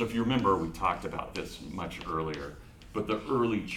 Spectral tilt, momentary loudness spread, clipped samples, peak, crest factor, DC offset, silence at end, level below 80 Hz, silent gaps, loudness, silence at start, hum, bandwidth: -6 dB/octave; 13 LU; under 0.1%; -14 dBFS; 18 dB; under 0.1%; 0 s; -50 dBFS; none; -32 LUFS; 0 s; none; 16 kHz